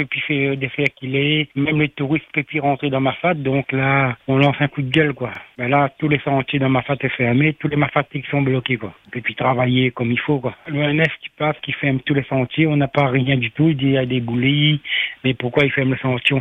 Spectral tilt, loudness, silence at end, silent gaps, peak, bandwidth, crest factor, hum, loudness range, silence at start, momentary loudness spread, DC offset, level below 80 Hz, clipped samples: -8 dB/octave; -19 LUFS; 0 s; none; 0 dBFS; 4 kHz; 18 dB; none; 2 LU; 0 s; 5 LU; under 0.1%; -52 dBFS; under 0.1%